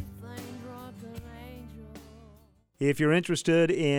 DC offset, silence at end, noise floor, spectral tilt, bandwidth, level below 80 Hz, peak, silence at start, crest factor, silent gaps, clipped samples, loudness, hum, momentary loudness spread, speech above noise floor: under 0.1%; 0 s; -59 dBFS; -5.5 dB/octave; 17.5 kHz; -56 dBFS; -12 dBFS; 0 s; 18 dB; none; under 0.1%; -25 LUFS; none; 22 LU; 34 dB